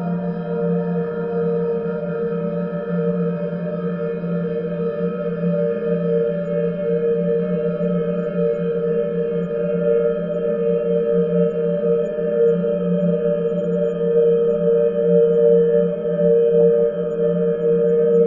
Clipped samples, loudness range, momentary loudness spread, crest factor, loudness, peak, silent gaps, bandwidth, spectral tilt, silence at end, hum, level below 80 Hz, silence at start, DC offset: under 0.1%; 6 LU; 8 LU; 14 dB; -19 LUFS; -4 dBFS; none; 3.4 kHz; -11.5 dB/octave; 0 s; none; -54 dBFS; 0 s; under 0.1%